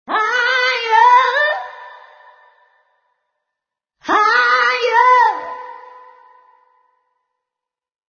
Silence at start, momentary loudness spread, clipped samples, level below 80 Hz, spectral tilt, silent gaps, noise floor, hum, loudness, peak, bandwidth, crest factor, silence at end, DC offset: 0.1 s; 21 LU; under 0.1%; -68 dBFS; 0 dB/octave; none; -85 dBFS; none; -13 LUFS; 0 dBFS; 6.8 kHz; 18 dB; 2.3 s; under 0.1%